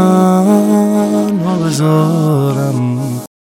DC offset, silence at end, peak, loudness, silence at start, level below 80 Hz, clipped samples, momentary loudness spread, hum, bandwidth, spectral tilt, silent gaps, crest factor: under 0.1%; 0.3 s; 0 dBFS; -12 LUFS; 0 s; -62 dBFS; under 0.1%; 7 LU; none; 17 kHz; -7.5 dB/octave; none; 12 dB